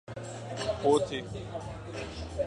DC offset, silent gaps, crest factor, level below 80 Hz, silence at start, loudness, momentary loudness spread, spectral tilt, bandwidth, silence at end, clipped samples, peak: under 0.1%; none; 20 dB; -50 dBFS; 0.1 s; -33 LUFS; 14 LU; -5.5 dB/octave; 11 kHz; 0 s; under 0.1%; -12 dBFS